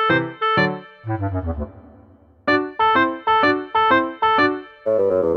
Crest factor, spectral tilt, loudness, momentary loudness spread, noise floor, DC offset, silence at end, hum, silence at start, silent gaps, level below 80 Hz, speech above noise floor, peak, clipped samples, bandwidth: 16 dB; -7 dB/octave; -19 LUFS; 11 LU; -49 dBFS; under 0.1%; 0 s; none; 0 s; none; -42 dBFS; 27 dB; -4 dBFS; under 0.1%; 6.8 kHz